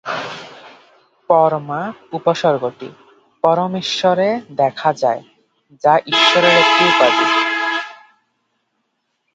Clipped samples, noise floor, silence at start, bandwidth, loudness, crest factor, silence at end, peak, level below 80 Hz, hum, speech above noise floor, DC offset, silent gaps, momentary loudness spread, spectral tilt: under 0.1%; -70 dBFS; 0.05 s; 9.2 kHz; -15 LUFS; 18 dB; 1.4 s; 0 dBFS; -68 dBFS; none; 55 dB; under 0.1%; none; 16 LU; -4 dB/octave